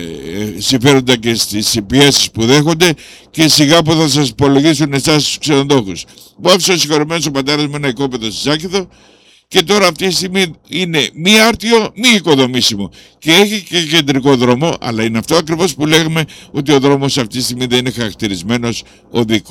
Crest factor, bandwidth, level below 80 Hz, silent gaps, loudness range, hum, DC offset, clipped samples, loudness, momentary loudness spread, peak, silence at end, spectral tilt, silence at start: 12 dB; 19 kHz; -44 dBFS; none; 4 LU; none; under 0.1%; under 0.1%; -12 LUFS; 11 LU; 0 dBFS; 0 s; -4 dB/octave; 0 s